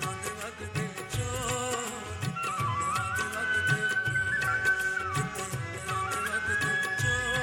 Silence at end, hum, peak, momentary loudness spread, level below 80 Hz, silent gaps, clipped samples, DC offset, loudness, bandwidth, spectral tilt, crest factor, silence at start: 0 s; none; -14 dBFS; 8 LU; -52 dBFS; none; under 0.1%; under 0.1%; -29 LUFS; 16.5 kHz; -3 dB/octave; 18 dB; 0 s